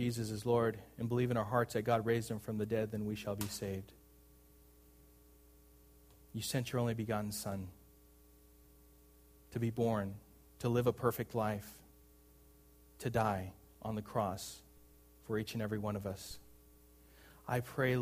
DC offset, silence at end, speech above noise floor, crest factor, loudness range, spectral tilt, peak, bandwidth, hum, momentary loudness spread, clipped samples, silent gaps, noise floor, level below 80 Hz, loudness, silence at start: under 0.1%; 0 s; 27 dB; 22 dB; 7 LU; -6 dB/octave; -18 dBFS; 15.5 kHz; none; 14 LU; under 0.1%; none; -63 dBFS; -64 dBFS; -38 LUFS; 0 s